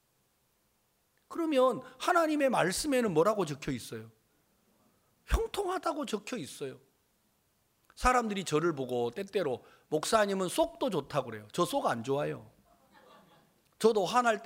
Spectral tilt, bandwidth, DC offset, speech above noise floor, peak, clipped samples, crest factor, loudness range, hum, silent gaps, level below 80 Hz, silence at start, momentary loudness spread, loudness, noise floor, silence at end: -4.5 dB/octave; 16 kHz; under 0.1%; 43 dB; -12 dBFS; under 0.1%; 20 dB; 8 LU; none; none; -48 dBFS; 1.3 s; 11 LU; -31 LUFS; -74 dBFS; 0 s